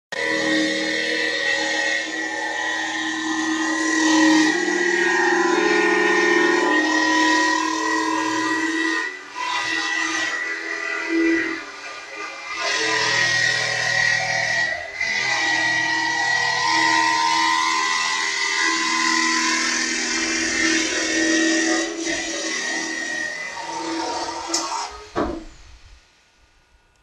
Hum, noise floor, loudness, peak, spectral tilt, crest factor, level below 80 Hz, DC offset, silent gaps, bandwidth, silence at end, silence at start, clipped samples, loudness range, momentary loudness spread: none; -57 dBFS; -20 LUFS; -6 dBFS; -1.5 dB/octave; 16 dB; -54 dBFS; under 0.1%; none; 12.5 kHz; 1.1 s; 0.1 s; under 0.1%; 6 LU; 9 LU